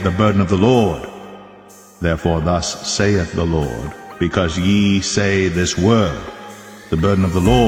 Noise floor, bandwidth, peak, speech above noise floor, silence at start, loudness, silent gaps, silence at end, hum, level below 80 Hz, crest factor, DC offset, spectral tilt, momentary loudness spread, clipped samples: -42 dBFS; 15 kHz; 0 dBFS; 27 dB; 0 s; -17 LUFS; none; 0 s; none; -34 dBFS; 16 dB; under 0.1%; -5.5 dB/octave; 16 LU; under 0.1%